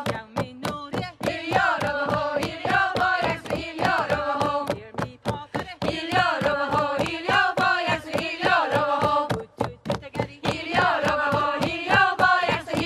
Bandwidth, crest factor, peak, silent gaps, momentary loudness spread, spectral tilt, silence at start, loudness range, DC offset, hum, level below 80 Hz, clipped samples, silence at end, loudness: 15 kHz; 20 dB; -4 dBFS; none; 10 LU; -5 dB/octave; 0 s; 3 LU; under 0.1%; none; -50 dBFS; under 0.1%; 0 s; -24 LUFS